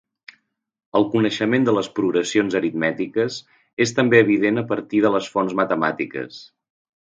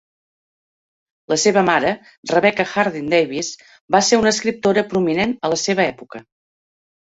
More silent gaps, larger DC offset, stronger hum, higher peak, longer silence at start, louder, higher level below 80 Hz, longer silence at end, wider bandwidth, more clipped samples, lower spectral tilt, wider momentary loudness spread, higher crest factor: second, 3.73-3.77 s vs 2.18-2.23 s, 3.81-3.88 s; neither; neither; about the same, 0 dBFS vs -2 dBFS; second, 0.95 s vs 1.3 s; about the same, -20 LUFS vs -18 LUFS; second, -64 dBFS vs -56 dBFS; about the same, 0.7 s vs 0.8 s; first, 9.2 kHz vs 8 kHz; neither; first, -5.5 dB/octave vs -3.5 dB/octave; about the same, 12 LU vs 13 LU; about the same, 20 dB vs 18 dB